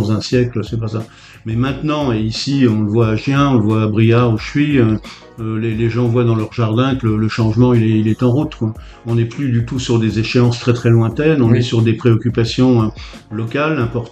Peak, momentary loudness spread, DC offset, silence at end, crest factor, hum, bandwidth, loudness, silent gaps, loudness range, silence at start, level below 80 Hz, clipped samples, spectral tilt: 0 dBFS; 10 LU; under 0.1%; 0 s; 14 dB; none; 8.4 kHz; -15 LUFS; none; 2 LU; 0 s; -38 dBFS; under 0.1%; -7.5 dB/octave